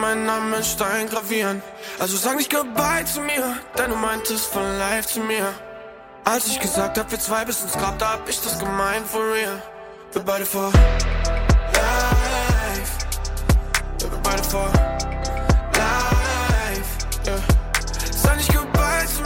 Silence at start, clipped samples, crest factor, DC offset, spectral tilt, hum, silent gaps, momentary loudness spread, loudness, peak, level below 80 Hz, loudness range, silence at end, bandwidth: 0 s; under 0.1%; 20 dB; under 0.1%; -4 dB/octave; none; none; 7 LU; -21 LUFS; 0 dBFS; -26 dBFS; 3 LU; 0 s; 17 kHz